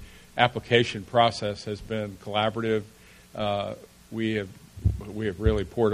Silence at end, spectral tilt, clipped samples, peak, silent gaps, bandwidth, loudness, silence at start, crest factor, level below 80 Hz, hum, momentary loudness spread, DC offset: 0 s; -6 dB/octave; under 0.1%; -4 dBFS; none; 15 kHz; -27 LUFS; 0 s; 24 dB; -40 dBFS; none; 13 LU; under 0.1%